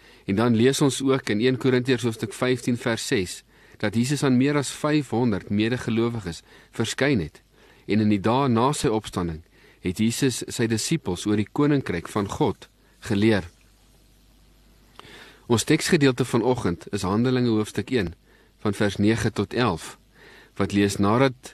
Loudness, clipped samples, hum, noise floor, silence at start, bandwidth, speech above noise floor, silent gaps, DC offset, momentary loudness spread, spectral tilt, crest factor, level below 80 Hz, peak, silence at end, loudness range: -23 LUFS; under 0.1%; none; -56 dBFS; 0.3 s; 13 kHz; 33 dB; none; under 0.1%; 10 LU; -5.5 dB/octave; 18 dB; -52 dBFS; -6 dBFS; 0.05 s; 3 LU